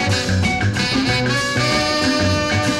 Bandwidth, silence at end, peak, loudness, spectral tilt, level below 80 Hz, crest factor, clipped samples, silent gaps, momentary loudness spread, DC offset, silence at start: 15 kHz; 0 s; -6 dBFS; -17 LUFS; -4.5 dB/octave; -38 dBFS; 12 dB; under 0.1%; none; 2 LU; under 0.1%; 0 s